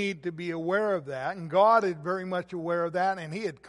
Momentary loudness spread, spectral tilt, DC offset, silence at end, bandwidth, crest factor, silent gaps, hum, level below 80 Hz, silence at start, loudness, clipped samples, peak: 12 LU; -6.5 dB/octave; under 0.1%; 0 s; 11.5 kHz; 18 dB; none; none; -70 dBFS; 0 s; -28 LUFS; under 0.1%; -8 dBFS